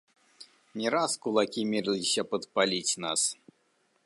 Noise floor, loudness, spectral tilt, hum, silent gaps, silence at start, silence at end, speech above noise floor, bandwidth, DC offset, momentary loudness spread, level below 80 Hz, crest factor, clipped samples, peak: -71 dBFS; -28 LUFS; -2.5 dB/octave; none; none; 0.4 s; 0.7 s; 42 dB; 11.5 kHz; under 0.1%; 5 LU; -76 dBFS; 20 dB; under 0.1%; -10 dBFS